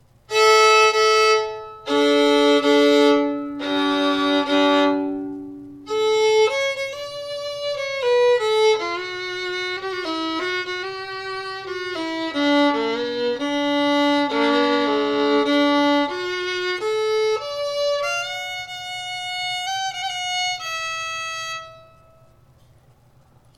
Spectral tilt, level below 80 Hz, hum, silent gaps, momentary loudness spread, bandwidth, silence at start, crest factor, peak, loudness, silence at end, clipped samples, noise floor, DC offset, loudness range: -2.5 dB/octave; -62 dBFS; none; none; 13 LU; 15 kHz; 0.3 s; 16 dB; -4 dBFS; -20 LUFS; 1.75 s; under 0.1%; -54 dBFS; under 0.1%; 8 LU